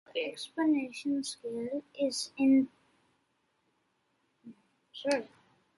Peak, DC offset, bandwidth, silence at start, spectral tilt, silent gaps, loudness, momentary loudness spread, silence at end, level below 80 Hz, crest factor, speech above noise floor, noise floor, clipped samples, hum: -16 dBFS; under 0.1%; 11.5 kHz; 0.15 s; -3.5 dB/octave; none; -32 LUFS; 12 LU; 0.5 s; -78 dBFS; 18 dB; 45 dB; -76 dBFS; under 0.1%; none